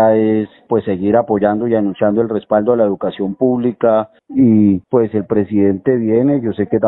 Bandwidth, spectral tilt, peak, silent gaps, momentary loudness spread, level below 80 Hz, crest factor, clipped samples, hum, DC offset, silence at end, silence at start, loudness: 4.1 kHz; -13 dB/octave; 0 dBFS; none; 5 LU; -52 dBFS; 14 dB; under 0.1%; none; under 0.1%; 0 s; 0 s; -15 LUFS